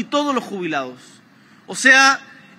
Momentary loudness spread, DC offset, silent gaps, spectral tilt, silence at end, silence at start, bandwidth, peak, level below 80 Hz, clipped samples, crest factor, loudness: 17 LU; under 0.1%; none; -1.5 dB/octave; 0.4 s; 0 s; 16 kHz; 0 dBFS; -80 dBFS; under 0.1%; 20 dB; -16 LUFS